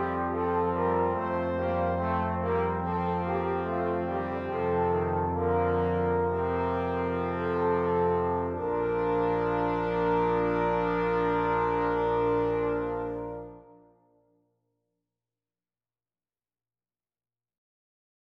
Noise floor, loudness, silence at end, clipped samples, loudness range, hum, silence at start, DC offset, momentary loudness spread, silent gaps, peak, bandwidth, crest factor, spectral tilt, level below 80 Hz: under -90 dBFS; -28 LUFS; 4.65 s; under 0.1%; 5 LU; none; 0 s; under 0.1%; 4 LU; none; -14 dBFS; 5.8 kHz; 14 dB; -9 dB/octave; -50 dBFS